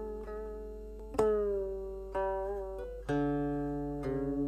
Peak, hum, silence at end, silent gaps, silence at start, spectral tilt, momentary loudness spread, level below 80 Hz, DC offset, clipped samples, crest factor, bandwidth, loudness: -16 dBFS; none; 0 s; none; 0 s; -8 dB/octave; 11 LU; -46 dBFS; under 0.1%; under 0.1%; 18 dB; 13 kHz; -35 LUFS